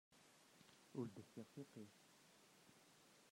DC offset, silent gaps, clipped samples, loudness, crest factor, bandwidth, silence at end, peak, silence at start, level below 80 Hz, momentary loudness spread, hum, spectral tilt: under 0.1%; none; under 0.1%; -59 LUFS; 24 dB; 16 kHz; 0 s; -36 dBFS; 0.1 s; under -90 dBFS; 17 LU; none; -6 dB/octave